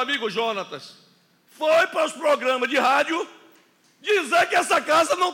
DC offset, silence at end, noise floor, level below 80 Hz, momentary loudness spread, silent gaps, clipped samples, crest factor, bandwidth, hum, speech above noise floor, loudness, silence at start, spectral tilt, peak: under 0.1%; 0 s; -58 dBFS; -82 dBFS; 12 LU; none; under 0.1%; 14 dB; 17 kHz; none; 36 dB; -21 LUFS; 0 s; -2 dB/octave; -8 dBFS